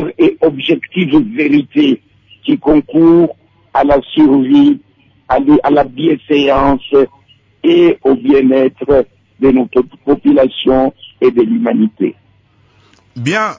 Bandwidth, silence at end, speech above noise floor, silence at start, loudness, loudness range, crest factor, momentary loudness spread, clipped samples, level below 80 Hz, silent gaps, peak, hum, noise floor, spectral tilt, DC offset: 7.6 kHz; 0.05 s; 40 dB; 0 s; -11 LUFS; 2 LU; 10 dB; 8 LU; under 0.1%; -38 dBFS; none; -2 dBFS; none; -50 dBFS; -7 dB/octave; under 0.1%